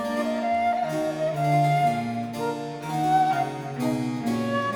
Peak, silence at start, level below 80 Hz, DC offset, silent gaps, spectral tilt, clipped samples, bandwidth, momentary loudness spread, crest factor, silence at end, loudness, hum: -12 dBFS; 0 s; -62 dBFS; under 0.1%; none; -6.5 dB/octave; under 0.1%; 19 kHz; 8 LU; 12 dB; 0 s; -25 LUFS; none